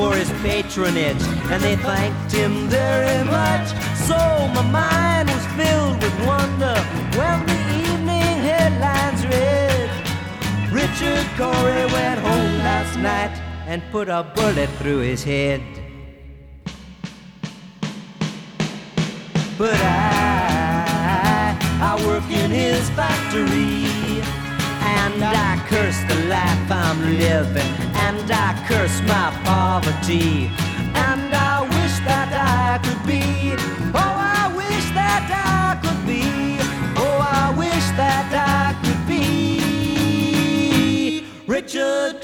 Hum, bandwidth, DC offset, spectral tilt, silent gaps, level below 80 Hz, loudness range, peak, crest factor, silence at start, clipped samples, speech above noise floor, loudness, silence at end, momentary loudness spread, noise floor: none; 19.5 kHz; under 0.1%; -5 dB/octave; none; -36 dBFS; 4 LU; -4 dBFS; 16 dB; 0 s; under 0.1%; 21 dB; -19 LUFS; 0 s; 7 LU; -40 dBFS